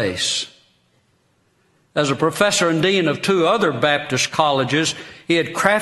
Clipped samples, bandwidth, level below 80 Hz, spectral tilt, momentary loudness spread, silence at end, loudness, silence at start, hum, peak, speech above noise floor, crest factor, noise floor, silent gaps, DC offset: under 0.1%; 12 kHz; -58 dBFS; -3.5 dB/octave; 6 LU; 0 s; -18 LUFS; 0 s; none; 0 dBFS; 44 dB; 20 dB; -62 dBFS; none; under 0.1%